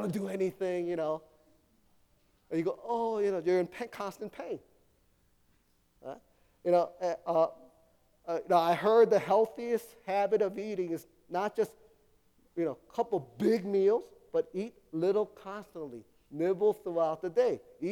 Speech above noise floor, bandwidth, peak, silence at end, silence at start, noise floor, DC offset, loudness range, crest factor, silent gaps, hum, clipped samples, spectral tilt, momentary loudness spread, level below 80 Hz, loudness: 39 dB; 17 kHz; -14 dBFS; 0 s; 0 s; -70 dBFS; under 0.1%; 7 LU; 18 dB; none; none; under 0.1%; -6.5 dB/octave; 16 LU; -74 dBFS; -31 LUFS